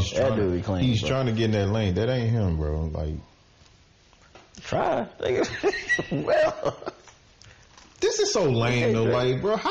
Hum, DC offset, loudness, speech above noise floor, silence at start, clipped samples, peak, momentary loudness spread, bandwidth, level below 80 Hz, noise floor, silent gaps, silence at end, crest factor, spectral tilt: none; under 0.1%; -25 LUFS; 32 dB; 0 s; under 0.1%; -12 dBFS; 8 LU; 8.4 kHz; -42 dBFS; -56 dBFS; none; 0 s; 14 dB; -5.5 dB/octave